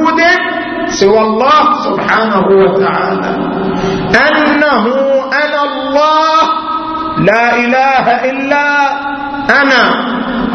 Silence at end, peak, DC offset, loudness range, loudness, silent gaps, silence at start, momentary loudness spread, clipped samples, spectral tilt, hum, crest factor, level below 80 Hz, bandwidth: 0 s; 0 dBFS; under 0.1%; 1 LU; -10 LUFS; none; 0 s; 7 LU; under 0.1%; -5 dB/octave; none; 10 dB; -40 dBFS; 6.6 kHz